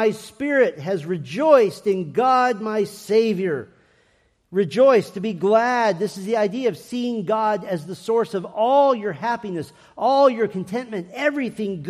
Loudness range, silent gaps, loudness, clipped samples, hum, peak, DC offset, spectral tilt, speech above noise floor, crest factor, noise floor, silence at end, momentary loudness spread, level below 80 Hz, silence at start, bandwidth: 2 LU; none; -21 LUFS; under 0.1%; none; -2 dBFS; under 0.1%; -6 dB/octave; 42 dB; 20 dB; -62 dBFS; 0 s; 12 LU; -68 dBFS; 0 s; 14.5 kHz